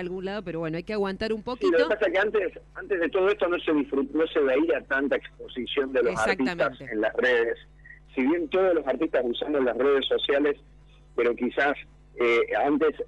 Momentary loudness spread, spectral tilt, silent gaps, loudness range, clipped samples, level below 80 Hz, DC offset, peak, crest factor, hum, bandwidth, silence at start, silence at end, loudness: 9 LU; -5.5 dB/octave; none; 1 LU; under 0.1%; -54 dBFS; under 0.1%; -10 dBFS; 16 dB; none; 11 kHz; 0 s; 0 s; -25 LUFS